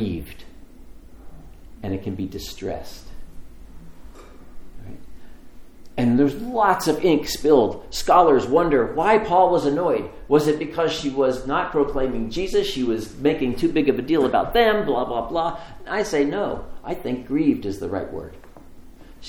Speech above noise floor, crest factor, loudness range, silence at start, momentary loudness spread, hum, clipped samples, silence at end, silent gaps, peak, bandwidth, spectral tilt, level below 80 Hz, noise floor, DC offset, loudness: 21 dB; 20 dB; 15 LU; 0 s; 14 LU; none; under 0.1%; 0 s; none; -2 dBFS; 19.5 kHz; -5.5 dB/octave; -40 dBFS; -42 dBFS; under 0.1%; -21 LUFS